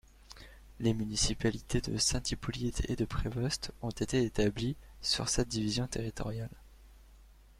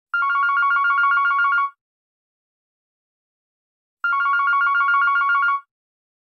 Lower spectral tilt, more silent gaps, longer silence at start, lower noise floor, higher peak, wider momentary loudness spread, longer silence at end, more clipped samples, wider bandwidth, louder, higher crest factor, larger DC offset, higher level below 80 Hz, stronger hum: first, -4 dB/octave vs 4.5 dB/octave; second, none vs 1.81-3.97 s; first, 0.3 s vs 0.15 s; second, -57 dBFS vs under -90 dBFS; second, -14 dBFS vs -10 dBFS; first, 10 LU vs 6 LU; second, 0.25 s vs 0.75 s; neither; first, 15.5 kHz vs 6 kHz; second, -33 LUFS vs -18 LUFS; first, 20 dB vs 12 dB; neither; first, -44 dBFS vs under -90 dBFS; neither